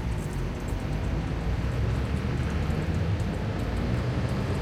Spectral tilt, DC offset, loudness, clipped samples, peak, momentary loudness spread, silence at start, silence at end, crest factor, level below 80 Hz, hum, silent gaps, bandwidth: -7 dB/octave; under 0.1%; -29 LUFS; under 0.1%; -14 dBFS; 3 LU; 0 s; 0 s; 12 dB; -34 dBFS; none; none; 15.5 kHz